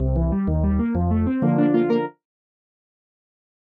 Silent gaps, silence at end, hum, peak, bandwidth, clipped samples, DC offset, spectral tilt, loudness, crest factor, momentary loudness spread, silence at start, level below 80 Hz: none; 1.65 s; none; -6 dBFS; 4.9 kHz; under 0.1%; under 0.1%; -11.5 dB/octave; -21 LUFS; 16 dB; 4 LU; 0 s; -30 dBFS